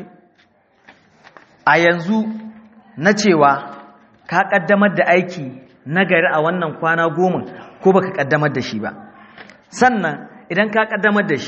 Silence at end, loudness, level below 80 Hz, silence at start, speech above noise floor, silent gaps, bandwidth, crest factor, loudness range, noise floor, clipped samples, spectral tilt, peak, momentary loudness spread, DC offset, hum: 0 s; -16 LUFS; -62 dBFS; 0 s; 40 dB; none; 7.4 kHz; 18 dB; 3 LU; -56 dBFS; under 0.1%; -4 dB/octave; 0 dBFS; 16 LU; under 0.1%; none